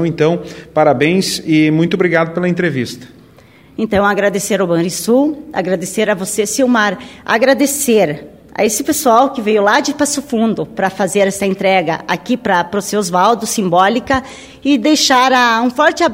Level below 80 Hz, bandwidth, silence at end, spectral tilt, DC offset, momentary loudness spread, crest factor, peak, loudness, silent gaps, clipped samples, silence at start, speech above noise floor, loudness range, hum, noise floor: -48 dBFS; 16.5 kHz; 0 s; -4 dB/octave; under 0.1%; 7 LU; 14 dB; 0 dBFS; -14 LUFS; none; under 0.1%; 0 s; 30 dB; 3 LU; none; -43 dBFS